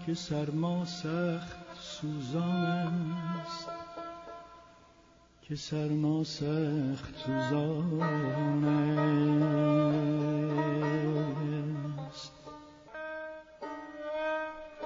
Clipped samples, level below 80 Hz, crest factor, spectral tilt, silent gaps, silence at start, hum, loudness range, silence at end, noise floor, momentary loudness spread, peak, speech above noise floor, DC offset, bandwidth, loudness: under 0.1%; -64 dBFS; 14 dB; -7 dB/octave; none; 0 s; none; 9 LU; 0 s; -61 dBFS; 16 LU; -18 dBFS; 30 dB; under 0.1%; 7.6 kHz; -32 LUFS